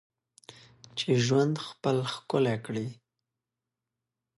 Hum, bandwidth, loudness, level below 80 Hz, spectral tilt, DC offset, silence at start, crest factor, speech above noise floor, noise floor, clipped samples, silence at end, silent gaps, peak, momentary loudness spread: none; 11.5 kHz; -29 LUFS; -70 dBFS; -5.5 dB/octave; under 0.1%; 0.5 s; 18 dB; 60 dB; -88 dBFS; under 0.1%; 1.45 s; none; -14 dBFS; 11 LU